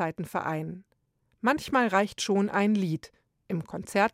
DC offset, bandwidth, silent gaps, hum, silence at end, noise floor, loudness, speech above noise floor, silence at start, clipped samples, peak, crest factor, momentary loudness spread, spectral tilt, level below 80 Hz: under 0.1%; 15.5 kHz; none; none; 0.05 s; -72 dBFS; -28 LUFS; 44 dB; 0 s; under 0.1%; -10 dBFS; 20 dB; 11 LU; -5.5 dB/octave; -64 dBFS